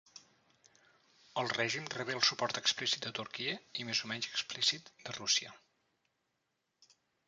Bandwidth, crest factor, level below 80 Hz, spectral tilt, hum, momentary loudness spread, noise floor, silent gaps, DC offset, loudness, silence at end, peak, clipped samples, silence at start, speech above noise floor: 10 kHz; 24 dB; -80 dBFS; -1.5 dB/octave; none; 10 LU; -84 dBFS; none; under 0.1%; -34 LUFS; 1.7 s; -14 dBFS; under 0.1%; 0.15 s; 47 dB